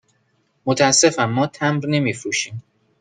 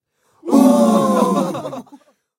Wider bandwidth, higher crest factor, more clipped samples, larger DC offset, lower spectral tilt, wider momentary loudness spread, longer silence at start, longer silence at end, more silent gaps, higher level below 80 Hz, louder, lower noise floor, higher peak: second, 10.5 kHz vs 16.5 kHz; about the same, 18 dB vs 16 dB; neither; neither; second, -3.5 dB/octave vs -6.5 dB/octave; second, 14 LU vs 20 LU; first, 0.65 s vs 0.45 s; second, 0.4 s vs 0.55 s; neither; about the same, -62 dBFS vs -64 dBFS; second, -18 LUFS vs -15 LUFS; first, -65 dBFS vs -48 dBFS; about the same, -2 dBFS vs 0 dBFS